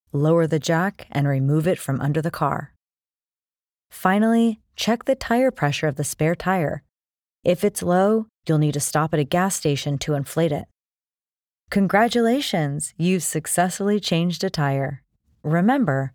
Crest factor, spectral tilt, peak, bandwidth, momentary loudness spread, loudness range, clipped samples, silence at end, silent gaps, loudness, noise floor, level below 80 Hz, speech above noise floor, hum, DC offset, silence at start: 18 dB; -5.5 dB/octave; -4 dBFS; 19.5 kHz; 6 LU; 2 LU; under 0.1%; 0.05 s; 3.24-3.28 s; -22 LUFS; under -90 dBFS; -54 dBFS; over 69 dB; none; under 0.1%; 0.15 s